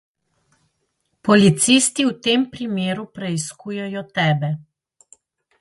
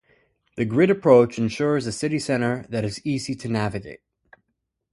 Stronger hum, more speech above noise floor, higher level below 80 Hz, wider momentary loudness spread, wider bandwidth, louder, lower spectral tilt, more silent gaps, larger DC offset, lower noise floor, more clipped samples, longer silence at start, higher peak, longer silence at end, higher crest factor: neither; second, 52 dB vs 56 dB; about the same, -60 dBFS vs -56 dBFS; about the same, 14 LU vs 13 LU; about the same, 11.5 kHz vs 11.5 kHz; first, -19 LUFS vs -22 LUFS; second, -4 dB/octave vs -6 dB/octave; neither; neither; second, -71 dBFS vs -78 dBFS; neither; first, 1.25 s vs 0.55 s; about the same, 0 dBFS vs -2 dBFS; about the same, 1 s vs 0.95 s; about the same, 20 dB vs 20 dB